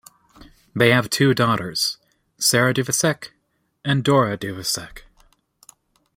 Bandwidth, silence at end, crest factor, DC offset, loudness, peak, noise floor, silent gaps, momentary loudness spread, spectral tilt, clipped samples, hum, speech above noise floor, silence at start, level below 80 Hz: 16.5 kHz; 1.15 s; 22 dB; under 0.1%; -19 LUFS; -2 dBFS; -69 dBFS; none; 15 LU; -4 dB/octave; under 0.1%; none; 50 dB; 0.4 s; -56 dBFS